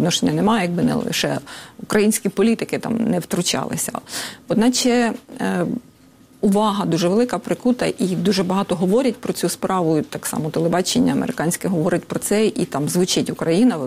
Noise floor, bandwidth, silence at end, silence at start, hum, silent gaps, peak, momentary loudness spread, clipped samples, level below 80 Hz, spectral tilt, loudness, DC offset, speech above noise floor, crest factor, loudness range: -49 dBFS; 16 kHz; 0 s; 0 s; none; none; -4 dBFS; 6 LU; under 0.1%; -54 dBFS; -4.5 dB/octave; -20 LUFS; under 0.1%; 30 dB; 16 dB; 1 LU